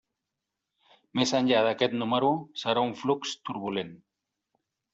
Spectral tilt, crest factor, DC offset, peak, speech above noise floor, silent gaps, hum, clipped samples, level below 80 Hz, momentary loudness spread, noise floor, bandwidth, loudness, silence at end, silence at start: -4.5 dB/octave; 20 dB; under 0.1%; -10 dBFS; 58 dB; none; none; under 0.1%; -70 dBFS; 11 LU; -86 dBFS; 8 kHz; -28 LUFS; 0.95 s; 1.15 s